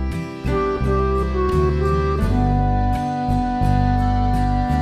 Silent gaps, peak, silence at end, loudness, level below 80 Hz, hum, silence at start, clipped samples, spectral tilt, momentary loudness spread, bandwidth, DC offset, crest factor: none; -4 dBFS; 0 s; -20 LUFS; -24 dBFS; none; 0 s; under 0.1%; -8.5 dB/octave; 3 LU; 13 kHz; under 0.1%; 14 dB